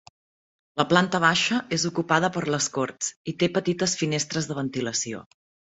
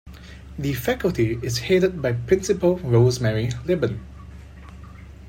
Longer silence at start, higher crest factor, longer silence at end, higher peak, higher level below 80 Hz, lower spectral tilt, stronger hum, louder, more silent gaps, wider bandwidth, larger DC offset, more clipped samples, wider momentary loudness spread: first, 0.75 s vs 0.05 s; first, 24 dB vs 18 dB; first, 0.5 s vs 0 s; first, -2 dBFS vs -6 dBFS; second, -62 dBFS vs -42 dBFS; second, -3.5 dB/octave vs -6.5 dB/octave; neither; about the same, -24 LUFS vs -22 LUFS; first, 3.16-3.25 s vs none; second, 8.2 kHz vs 16.5 kHz; neither; neither; second, 9 LU vs 23 LU